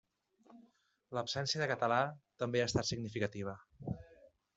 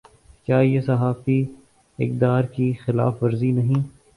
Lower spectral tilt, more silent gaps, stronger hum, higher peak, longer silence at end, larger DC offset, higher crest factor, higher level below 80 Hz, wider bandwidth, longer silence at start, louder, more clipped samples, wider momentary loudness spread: second, -4.5 dB/octave vs -10 dB/octave; neither; neither; second, -16 dBFS vs -4 dBFS; first, 0.45 s vs 0.25 s; neither; first, 22 dB vs 16 dB; second, -66 dBFS vs -54 dBFS; second, 8.2 kHz vs 10.5 kHz; about the same, 0.5 s vs 0.5 s; second, -37 LUFS vs -22 LUFS; neither; first, 12 LU vs 7 LU